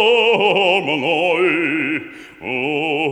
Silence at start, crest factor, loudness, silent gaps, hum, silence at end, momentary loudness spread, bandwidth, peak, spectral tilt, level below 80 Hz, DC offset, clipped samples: 0 s; 14 dB; -16 LUFS; none; none; 0 s; 11 LU; 10.5 kHz; -2 dBFS; -5 dB/octave; -64 dBFS; under 0.1%; under 0.1%